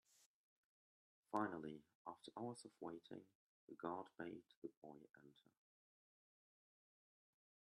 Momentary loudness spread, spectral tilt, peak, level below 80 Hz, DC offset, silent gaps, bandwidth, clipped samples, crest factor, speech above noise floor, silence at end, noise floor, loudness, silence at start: 17 LU; -6 dB/octave; -28 dBFS; under -90 dBFS; under 0.1%; 0.26-1.23 s, 1.95-2.05 s, 3.35-3.68 s, 4.57-4.62 s, 4.77-4.82 s; 12 kHz; under 0.1%; 28 dB; over 38 dB; 2.25 s; under -90 dBFS; -53 LUFS; 0.2 s